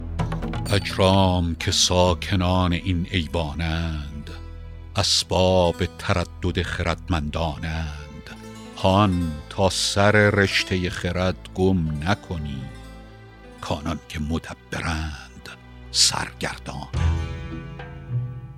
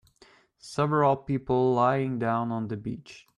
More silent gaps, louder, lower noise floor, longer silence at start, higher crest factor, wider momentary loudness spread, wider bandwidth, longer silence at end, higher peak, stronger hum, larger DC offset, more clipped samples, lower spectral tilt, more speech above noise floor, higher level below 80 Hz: neither; first, -23 LUFS vs -26 LUFS; second, -43 dBFS vs -59 dBFS; second, 0 s vs 0.65 s; first, 22 dB vs 16 dB; first, 20 LU vs 13 LU; first, 15.5 kHz vs 11.5 kHz; second, 0 s vs 0.2 s; first, -2 dBFS vs -10 dBFS; neither; neither; neither; second, -4.5 dB/octave vs -7.5 dB/octave; second, 21 dB vs 33 dB; first, -38 dBFS vs -60 dBFS